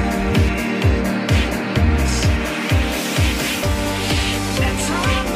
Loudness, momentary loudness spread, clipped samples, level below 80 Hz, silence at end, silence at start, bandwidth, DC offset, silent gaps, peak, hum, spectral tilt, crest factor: -19 LUFS; 2 LU; under 0.1%; -24 dBFS; 0 s; 0 s; 16 kHz; under 0.1%; none; -4 dBFS; none; -5 dB/octave; 14 dB